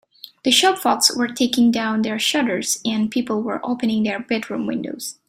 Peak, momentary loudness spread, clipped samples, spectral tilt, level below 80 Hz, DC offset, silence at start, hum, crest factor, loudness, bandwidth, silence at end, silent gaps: -2 dBFS; 9 LU; under 0.1%; -2.5 dB/octave; -62 dBFS; under 0.1%; 0.25 s; none; 18 dB; -19 LUFS; 16 kHz; 0.15 s; none